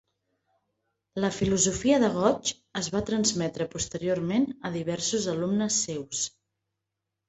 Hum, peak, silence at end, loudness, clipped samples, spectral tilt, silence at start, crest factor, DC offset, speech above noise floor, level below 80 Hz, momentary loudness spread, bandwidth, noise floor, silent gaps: none; -8 dBFS; 1 s; -27 LUFS; under 0.1%; -4 dB/octave; 1.15 s; 20 dB; under 0.1%; 58 dB; -54 dBFS; 8 LU; 8.4 kHz; -85 dBFS; none